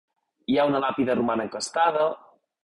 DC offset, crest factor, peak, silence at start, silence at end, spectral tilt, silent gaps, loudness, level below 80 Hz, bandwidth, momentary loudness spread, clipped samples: under 0.1%; 16 dB; -10 dBFS; 0.5 s; 0.45 s; -4.5 dB/octave; none; -24 LUFS; -64 dBFS; 11.5 kHz; 7 LU; under 0.1%